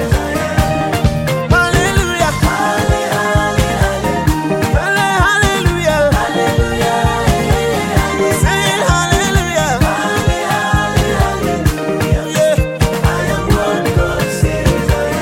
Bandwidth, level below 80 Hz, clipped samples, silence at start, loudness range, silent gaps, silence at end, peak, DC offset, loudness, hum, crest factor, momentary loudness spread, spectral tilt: 17 kHz; -22 dBFS; under 0.1%; 0 s; 1 LU; none; 0 s; 0 dBFS; under 0.1%; -14 LUFS; none; 12 dB; 3 LU; -5 dB/octave